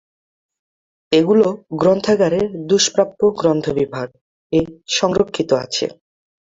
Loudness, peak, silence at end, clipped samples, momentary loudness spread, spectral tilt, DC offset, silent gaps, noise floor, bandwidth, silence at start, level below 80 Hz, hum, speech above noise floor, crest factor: -17 LUFS; -2 dBFS; 0.6 s; under 0.1%; 8 LU; -4.5 dB/octave; under 0.1%; 4.21-4.50 s; under -90 dBFS; 8 kHz; 1.1 s; -52 dBFS; none; over 73 dB; 16 dB